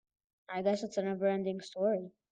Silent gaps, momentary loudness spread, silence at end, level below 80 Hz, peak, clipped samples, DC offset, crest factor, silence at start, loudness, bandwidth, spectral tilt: none; 6 LU; 0.2 s; -80 dBFS; -18 dBFS; under 0.1%; under 0.1%; 16 dB; 0.5 s; -34 LUFS; 9.2 kHz; -6 dB/octave